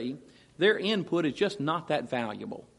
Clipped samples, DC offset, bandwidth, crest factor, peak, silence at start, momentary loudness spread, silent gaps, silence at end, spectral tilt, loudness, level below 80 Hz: under 0.1%; under 0.1%; 11.5 kHz; 20 dB; -10 dBFS; 0 s; 12 LU; none; 0.15 s; -5.5 dB/octave; -29 LUFS; -70 dBFS